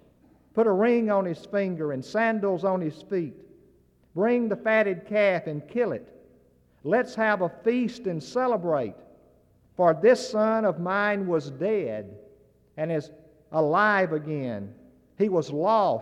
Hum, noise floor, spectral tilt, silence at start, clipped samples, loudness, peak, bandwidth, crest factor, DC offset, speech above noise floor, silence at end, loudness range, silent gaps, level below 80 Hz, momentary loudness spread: none; -61 dBFS; -6.5 dB/octave; 0.55 s; under 0.1%; -25 LUFS; -8 dBFS; 11 kHz; 18 dB; under 0.1%; 36 dB; 0 s; 3 LU; none; -68 dBFS; 12 LU